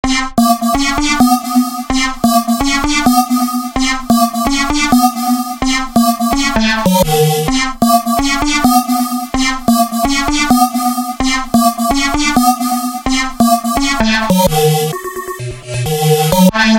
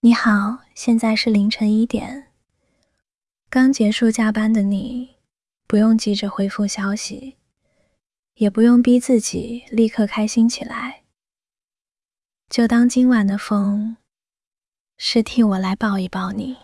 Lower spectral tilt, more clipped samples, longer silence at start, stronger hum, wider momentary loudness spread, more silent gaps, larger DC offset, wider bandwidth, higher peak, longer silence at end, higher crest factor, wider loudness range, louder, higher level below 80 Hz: about the same, -4 dB/octave vs -5 dB/octave; neither; about the same, 0.05 s vs 0.05 s; neither; second, 5 LU vs 12 LU; second, none vs 8.19-8.23 s, 12.05-12.09 s, 14.47-14.51 s, 14.80-14.85 s; neither; first, 17 kHz vs 12 kHz; first, 0 dBFS vs -4 dBFS; about the same, 0 s vs 0.1 s; about the same, 12 dB vs 16 dB; second, 1 LU vs 4 LU; first, -13 LUFS vs -18 LUFS; first, -28 dBFS vs -54 dBFS